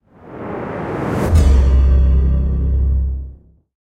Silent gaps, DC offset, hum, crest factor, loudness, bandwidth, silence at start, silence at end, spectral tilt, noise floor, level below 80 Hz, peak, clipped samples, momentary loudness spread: none; under 0.1%; none; 12 dB; -16 LUFS; 8.8 kHz; 0.25 s; 0.5 s; -8 dB/octave; -38 dBFS; -16 dBFS; -2 dBFS; under 0.1%; 16 LU